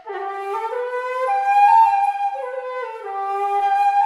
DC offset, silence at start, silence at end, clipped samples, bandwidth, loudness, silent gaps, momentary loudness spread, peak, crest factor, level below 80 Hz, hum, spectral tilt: under 0.1%; 0.05 s; 0 s; under 0.1%; 11.5 kHz; -19 LUFS; none; 15 LU; -4 dBFS; 14 dB; -80 dBFS; none; -0.5 dB/octave